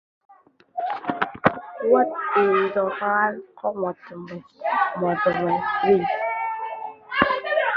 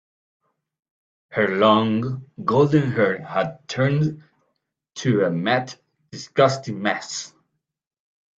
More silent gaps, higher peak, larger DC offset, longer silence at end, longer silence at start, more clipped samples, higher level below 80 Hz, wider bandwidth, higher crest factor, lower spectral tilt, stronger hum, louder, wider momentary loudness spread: neither; about the same, -2 dBFS vs -4 dBFS; neither; second, 0 s vs 1.1 s; second, 0.75 s vs 1.3 s; neither; about the same, -58 dBFS vs -62 dBFS; second, 5.6 kHz vs 8 kHz; about the same, 22 dB vs 20 dB; first, -8 dB/octave vs -6 dB/octave; neither; about the same, -23 LUFS vs -21 LUFS; second, 11 LU vs 14 LU